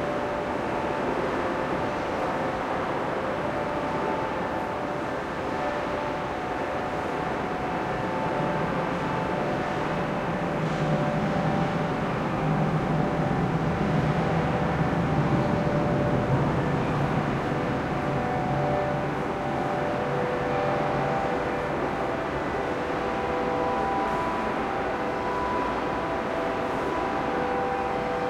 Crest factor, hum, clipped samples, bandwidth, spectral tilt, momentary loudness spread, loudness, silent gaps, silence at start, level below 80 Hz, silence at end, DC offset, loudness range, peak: 14 dB; none; under 0.1%; 13 kHz; -7 dB/octave; 4 LU; -27 LUFS; none; 0 s; -46 dBFS; 0 s; under 0.1%; 4 LU; -12 dBFS